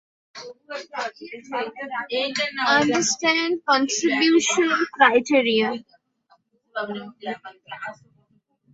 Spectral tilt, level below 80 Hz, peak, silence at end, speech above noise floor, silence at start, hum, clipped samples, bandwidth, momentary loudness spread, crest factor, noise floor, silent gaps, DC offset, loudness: -2 dB/octave; -70 dBFS; -2 dBFS; 0.8 s; 42 dB; 0.35 s; none; under 0.1%; 8 kHz; 18 LU; 22 dB; -65 dBFS; none; under 0.1%; -21 LUFS